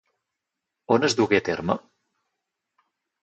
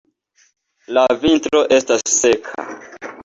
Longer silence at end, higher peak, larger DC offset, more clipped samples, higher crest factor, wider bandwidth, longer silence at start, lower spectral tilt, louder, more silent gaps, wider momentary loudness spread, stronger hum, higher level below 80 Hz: first, 1.45 s vs 0 s; second, -6 dBFS vs -2 dBFS; neither; neither; first, 22 dB vs 16 dB; about the same, 8.4 kHz vs 8 kHz; about the same, 0.9 s vs 0.9 s; first, -4.5 dB/octave vs -2 dB/octave; second, -23 LUFS vs -15 LUFS; neither; second, 8 LU vs 17 LU; neither; second, -60 dBFS vs -50 dBFS